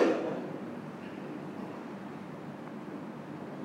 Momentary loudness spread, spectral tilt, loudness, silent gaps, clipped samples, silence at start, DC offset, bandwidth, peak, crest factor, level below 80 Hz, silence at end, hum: 8 LU; -7 dB/octave; -39 LUFS; none; under 0.1%; 0 s; under 0.1%; 15.5 kHz; -14 dBFS; 22 dB; -78 dBFS; 0 s; none